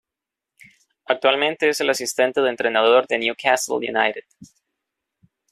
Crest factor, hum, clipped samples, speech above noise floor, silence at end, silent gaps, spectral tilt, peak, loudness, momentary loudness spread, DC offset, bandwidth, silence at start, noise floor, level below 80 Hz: 20 dB; none; under 0.1%; 66 dB; 1.05 s; none; -2 dB/octave; -2 dBFS; -19 LUFS; 6 LU; under 0.1%; 14.5 kHz; 1.1 s; -86 dBFS; -70 dBFS